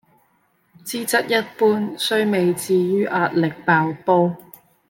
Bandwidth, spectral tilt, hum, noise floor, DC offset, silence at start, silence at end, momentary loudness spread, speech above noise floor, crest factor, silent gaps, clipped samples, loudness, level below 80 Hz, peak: 17 kHz; -5 dB/octave; none; -63 dBFS; under 0.1%; 0.85 s; 0.5 s; 6 LU; 44 dB; 18 dB; none; under 0.1%; -19 LUFS; -68 dBFS; -2 dBFS